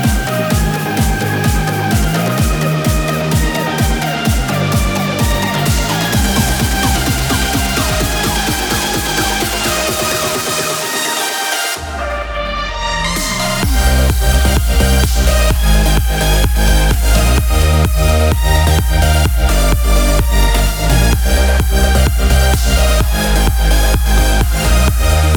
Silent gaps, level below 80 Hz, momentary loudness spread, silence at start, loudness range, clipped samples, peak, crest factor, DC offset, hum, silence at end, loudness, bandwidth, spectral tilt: none; -14 dBFS; 3 LU; 0 s; 3 LU; under 0.1%; 0 dBFS; 12 dB; under 0.1%; none; 0 s; -14 LUFS; over 20 kHz; -4 dB/octave